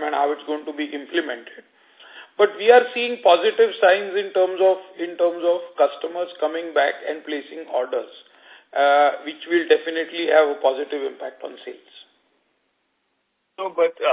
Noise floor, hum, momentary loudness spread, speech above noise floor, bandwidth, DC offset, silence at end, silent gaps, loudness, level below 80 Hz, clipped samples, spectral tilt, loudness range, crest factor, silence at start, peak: -72 dBFS; none; 15 LU; 51 dB; 4 kHz; under 0.1%; 0 s; none; -21 LUFS; -76 dBFS; under 0.1%; -6.5 dB/octave; 7 LU; 20 dB; 0 s; -2 dBFS